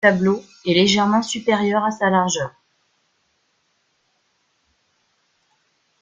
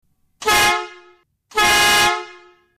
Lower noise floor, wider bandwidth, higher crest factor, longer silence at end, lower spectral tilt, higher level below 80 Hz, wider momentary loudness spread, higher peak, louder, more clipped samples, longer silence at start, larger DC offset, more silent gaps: first, -67 dBFS vs -53 dBFS; second, 9.4 kHz vs 15.5 kHz; first, 20 dB vs 12 dB; first, 3.5 s vs 0.45 s; first, -4.5 dB/octave vs -0.5 dB/octave; second, -60 dBFS vs -44 dBFS; second, 8 LU vs 13 LU; first, -2 dBFS vs -6 dBFS; second, -19 LUFS vs -15 LUFS; neither; second, 0 s vs 0.4 s; neither; neither